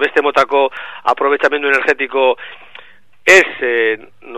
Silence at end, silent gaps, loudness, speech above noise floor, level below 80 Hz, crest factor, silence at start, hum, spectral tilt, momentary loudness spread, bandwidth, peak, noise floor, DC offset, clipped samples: 0 s; none; -13 LUFS; 30 dB; -58 dBFS; 14 dB; 0 s; none; -2 dB/octave; 11 LU; 13.5 kHz; 0 dBFS; -44 dBFS; 0.9%; 0.1%